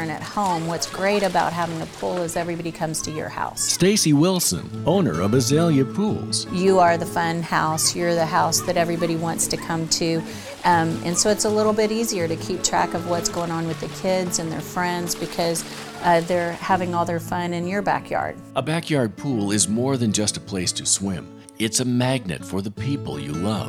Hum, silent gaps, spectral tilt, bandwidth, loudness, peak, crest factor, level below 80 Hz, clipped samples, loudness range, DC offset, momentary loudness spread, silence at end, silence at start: none; none; -4 dB/octave; 17.5 kHz; -22 LUFS; -6 dBFS; 16 dB; -50 dBFS; under 0.1%; 4 LU; under 0.1%; 9 LU; 0 s; 0 s